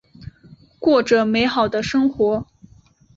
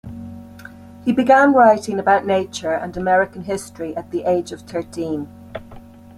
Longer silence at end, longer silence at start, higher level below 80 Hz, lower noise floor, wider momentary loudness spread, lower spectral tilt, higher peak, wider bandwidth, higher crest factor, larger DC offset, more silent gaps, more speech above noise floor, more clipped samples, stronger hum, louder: first, 0.75 s vs 0.4 s; first, 0.2 s vs 0.05 s; about the same, -50 dBFS vs -52 dBFS; first, -52 dBFS vs -40 dBFS; second, 5 LU vs 23 LU; about the same, -5.5 dB/octave vs -5.5 dB/octave; about the same, -4 dBFS vs -2 dBFS; second, 7.8 kHz vs 14 kHz; about the same, 18 dB vs 18 dB; neither; neither; first, 34 dB vs 22 dB; neither; neither; about the same, -18 LUFS vs -18 LUFS